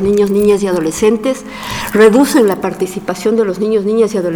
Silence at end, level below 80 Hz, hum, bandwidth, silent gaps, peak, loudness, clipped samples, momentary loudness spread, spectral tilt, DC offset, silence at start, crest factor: 0 s; -42 dBFS; none; 19.5 kHz; none; 0 dBFS; -13 LUFS; under 0.1%; 10 LU; -5.5 dB/octave; under 0.1%; 0 s; 12 dB